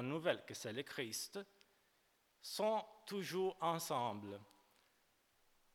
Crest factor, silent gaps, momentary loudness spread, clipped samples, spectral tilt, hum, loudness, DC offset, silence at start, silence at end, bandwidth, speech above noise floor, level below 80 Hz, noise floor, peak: 24 dB; none; 14 LU; under 0.1%; -4 dB/octave; none; -42 LUFS; under 0.1%; 0 s; 1.3 s; 19 kHz; 35 dB; -88 dBFS; -78 dBFS; -20 dBFS